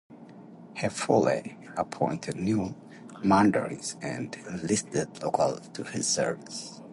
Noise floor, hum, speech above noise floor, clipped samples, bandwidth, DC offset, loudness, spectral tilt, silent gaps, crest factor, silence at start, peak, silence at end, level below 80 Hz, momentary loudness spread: -48 dBFS; none; 20 dB; under 0.1%; 11.5 kHz; under 0.1%; -29 LUFS; -4.5 dB/octave; none; 20 dB; 0.1 s; -8 dBFS; 0 s; -60 dBFS; 14 LU